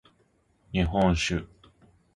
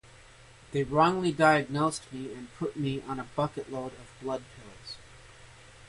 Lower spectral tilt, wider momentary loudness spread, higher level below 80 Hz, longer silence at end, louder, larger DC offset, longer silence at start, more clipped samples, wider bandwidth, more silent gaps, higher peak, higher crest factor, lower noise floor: about the same, -5.5 dB/octave vs -5.5 dB/octave; second, 9 LU vs 20 LU; first, -40 dBFS vs -58 dBFS; first, 0.7 s vs 0 s; about the same, -27 LUFS vs -29 LUFS; neither; about the same, 0.7 s vs 0.7 s; neither; about the same, 11.5 kHz vs 11.5 kHz; neither; about the same, -10 dBFS vs -8 dBFS; about the same, 20 dB vs 22 dB; first, -67 dBFS vs -54 dBFS